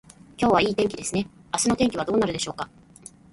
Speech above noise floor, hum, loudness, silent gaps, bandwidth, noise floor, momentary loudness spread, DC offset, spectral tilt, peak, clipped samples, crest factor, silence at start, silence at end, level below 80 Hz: 25 dB; none; -24 LUFS; none; 11.5 kHz; -48 dBFS; 10 LU; under 0.1%; -4 dB/octave; -6 dBFS; under 0.1%; 20 dB; 0.4 s; 0.65 s; -52 dBFS